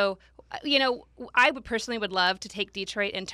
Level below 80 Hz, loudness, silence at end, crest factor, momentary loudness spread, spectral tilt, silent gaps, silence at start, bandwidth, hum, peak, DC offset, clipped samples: -58 dBFS; -26 LUFS; 0 s; 20 dB; 14 LU; -2.5 dB/octave; none; 0 s; 14.5 kHz; none; -8 dBFS; under 0.1%; under 0.1%